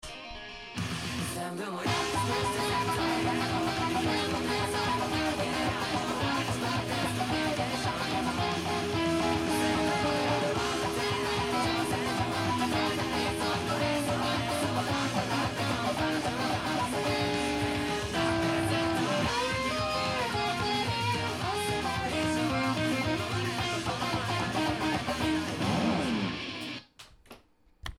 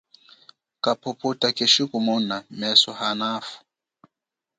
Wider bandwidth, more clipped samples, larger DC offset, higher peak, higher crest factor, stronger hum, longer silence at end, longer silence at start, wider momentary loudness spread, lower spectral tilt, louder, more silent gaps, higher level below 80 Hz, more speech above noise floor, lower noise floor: first, 16.5 kHz vs 9.4 kHz; neither; neither; second, -16 dBFS vs -2 dBFS; second, 14 dB vs 24 dB; neither; second, 0.05 s vs 1 s; second, 0.05 s vs 0.85 s; second, 3 LU vs 11 LU; first, -4.5 dB/octave vs -3 dB/octave; second, -30 LUFS vs -21 LUFS; neither; first, -50 dBFS vs -74 dBFS; second, 29 dB vs 63 dB; second, -59 dBFS vs -86 dBFS